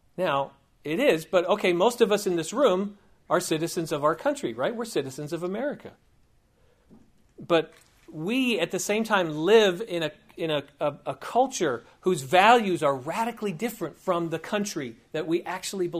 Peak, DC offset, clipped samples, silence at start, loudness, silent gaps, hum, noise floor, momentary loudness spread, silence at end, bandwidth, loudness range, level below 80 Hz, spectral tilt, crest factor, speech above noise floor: -4 dBFS; under 0.1%; under 0.1%; 0.2 s; -26 LUFS; none; none; -63 dBFS; 13 LU; 0 s; 15.5 kHz; 7 LU; -66 dBFS; -4.5 dB/octave; 22 dB; 37 dB